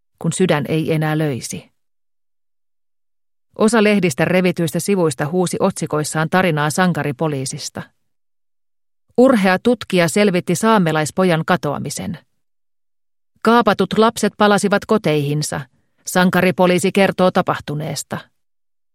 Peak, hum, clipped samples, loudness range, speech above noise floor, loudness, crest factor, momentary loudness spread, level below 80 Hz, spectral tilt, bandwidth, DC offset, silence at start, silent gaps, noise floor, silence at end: 0 dBFS; none; under 0.1%; 4 LU; over 74 dB; -17 LUFS; 18 dB; 11 LU; -56 dBFS; -5.5 dB/octave; 16.5 kHz; under 0.1%; 0.2 s; none; under -90 dBFS; 0.75 s